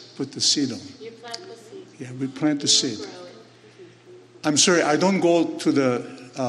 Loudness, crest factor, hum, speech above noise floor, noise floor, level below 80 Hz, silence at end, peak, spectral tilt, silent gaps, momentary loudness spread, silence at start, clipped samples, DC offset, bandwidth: -21 LUFS; 20 dB; none; 26 dB; -48 dBFS; -74 dBFS; 0 s; -4 dBFS; -3 dB/octave; none; 22 LU; 0 s; under 0.1%; under 0.1%; 12 kHz